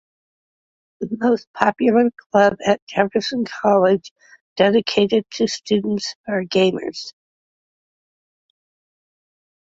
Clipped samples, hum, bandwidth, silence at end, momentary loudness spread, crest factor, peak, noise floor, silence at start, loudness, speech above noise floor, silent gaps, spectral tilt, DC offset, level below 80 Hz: under 0.1%; none; 7.8 kHz; 2.65 s; 11 LU; 20 dB; 0 dBFS; under -90 dBFS; 1 s; -19 LUFS; over 72 dB; 1.47-1.54 s, 2.26-2.30 s, 2.82-2.87 s, 4.11-4.16 s, 4.41-4.56 s, 6.15-6.24 s; -5 dB/octave; under 0.1%; -62 dBFS